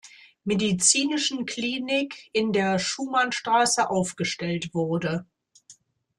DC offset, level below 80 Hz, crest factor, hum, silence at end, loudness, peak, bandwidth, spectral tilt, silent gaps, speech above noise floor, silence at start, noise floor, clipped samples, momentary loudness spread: under 0.1%; -64 dBFS; 20 dB; none; 0.45 s; -24 LUFS; -6 dBFS; 12.5 kHz; -3 dB/octave; none; 31 dB; 0.05 s; -56 dBFS; under 0.1%; 9 LU